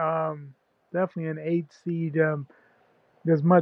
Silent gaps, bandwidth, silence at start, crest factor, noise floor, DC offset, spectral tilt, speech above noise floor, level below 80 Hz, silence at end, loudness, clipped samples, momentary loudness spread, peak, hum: none; 6 kHz; 0 s; 20 dB; -63 dBFS; under 0.1%; -10.5 dB/octave; 38 dB; -80 dBFS; 0 s; -27 LUFS; under 0.1%; 10 LU; -6 dBFS; none